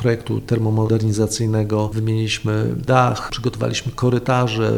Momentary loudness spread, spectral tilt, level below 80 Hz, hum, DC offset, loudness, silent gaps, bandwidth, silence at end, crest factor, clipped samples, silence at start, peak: 6 LU; -6 dB/octave; -42 dBFS; none; under 0.1%; -19 LUFS; none; 13 kHz; 0 s; 18 dB; under 0.1%; 0 s; -2 dBFS